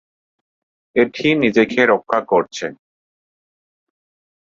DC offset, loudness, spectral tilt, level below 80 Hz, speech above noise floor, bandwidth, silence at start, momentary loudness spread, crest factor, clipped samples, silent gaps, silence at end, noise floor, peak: under 0.1%; -17 LUFS; -5 dB/octave; -60 dBFS; over 74 dB; 7.6 kHz; 0.95 s; 12 LU; 20 dB; under 0.1%; none; 1.65 s; under -90 dBFS; 0 dBFS